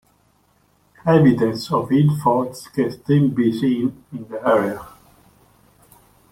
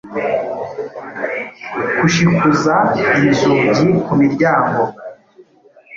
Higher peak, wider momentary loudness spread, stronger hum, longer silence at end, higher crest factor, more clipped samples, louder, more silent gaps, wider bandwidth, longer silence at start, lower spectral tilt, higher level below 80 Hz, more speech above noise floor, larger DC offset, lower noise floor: about the same, -2 dBFS vs -2 dBFS; about the same, 12 LU vs 13 LU; neither; first, 1.45 s vs 0 s; about the same, 18 dB vs 14 dB; neither; second, -19 LUFS vs -15 LUFS; neither; first, 15.5 kHz vs 7.6 kHz; first, 1.05 s vs 0.05 s; first, -8 dB/octave vs -6 dB/octave; about the same, -54 dBFS vs -50 dBFS; first, 42 dB vs 34 dB; neither; first, -60 dBFS vs -48 dBFS